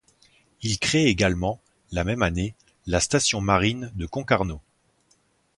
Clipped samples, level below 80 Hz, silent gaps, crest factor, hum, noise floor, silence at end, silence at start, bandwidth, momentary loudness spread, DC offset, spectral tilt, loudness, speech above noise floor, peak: under 0.1%; -40 dBFS; none; 24 dB; none; -65 dBFS; 1 s; 0.6 s; 11.5 kHz; 12 LU; under 0.1%; -4 dB/octave; -24 LUFS; 42 dB; -2 dBFS